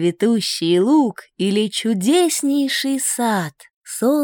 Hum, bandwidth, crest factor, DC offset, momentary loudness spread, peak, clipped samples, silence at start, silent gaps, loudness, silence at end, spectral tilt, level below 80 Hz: none; 17.5 kHz; 14 dB; under 0.1%; 8 LU; -4 dBFS; under 0.1%; 0 s; 3.73-3.82 s; -18 LUFS; 0 s; -4 dB/octave; -72 dBFS